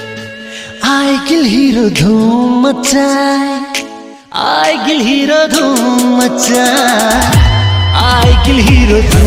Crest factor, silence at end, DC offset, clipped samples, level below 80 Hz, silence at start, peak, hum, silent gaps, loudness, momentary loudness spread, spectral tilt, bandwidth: 10 dB; 0 s; under 0.1%; 0.2%; -18 dBFS; 0 s; 0 dBFS; none; none; -9 LUFS; 9 LU; -4.5 dB/octave; 16.5 kHz